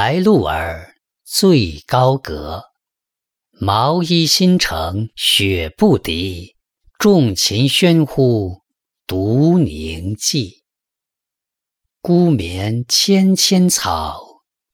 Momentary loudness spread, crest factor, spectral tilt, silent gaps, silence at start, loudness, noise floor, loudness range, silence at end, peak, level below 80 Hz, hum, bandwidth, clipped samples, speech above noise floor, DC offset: 14 LU; 14 dB; -4.5 dB/octave; none; 0 s; -15 LUFS; -84 dBFS; 4 LU; 0.5 s; -2 dBFS; -42 dBFS; none; 19.5 kHz; under 0.1%; 69 dB; under 0.1%